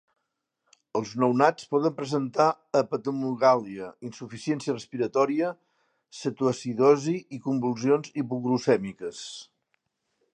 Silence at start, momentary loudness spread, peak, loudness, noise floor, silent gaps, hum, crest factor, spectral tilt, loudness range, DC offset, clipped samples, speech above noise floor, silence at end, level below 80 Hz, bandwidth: 0.95 s; 15 LU; -4 dBFS; -26 LUFS; -81 dBFS; none; none; 22 dB; -6 dB/octave; 3 LU; under 0.1%; under 0.1%; 55 dB; 0.9 s; -74 dBFS; 9.6 kHz